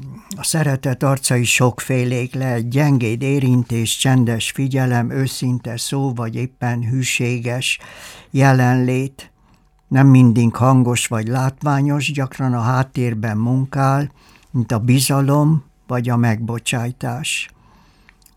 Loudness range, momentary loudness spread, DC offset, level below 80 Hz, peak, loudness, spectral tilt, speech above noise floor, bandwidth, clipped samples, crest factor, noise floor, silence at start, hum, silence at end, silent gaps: 4 LU; 9 LU; under 0.1%; -52 dBFS; 0 dBFS; -17 LUFS; -5.5 dB/octave; 37 dB; 16.5 kHz; under 0.1%; 16 dB; -54 dBFS; 0 s; none; 0.9 s; none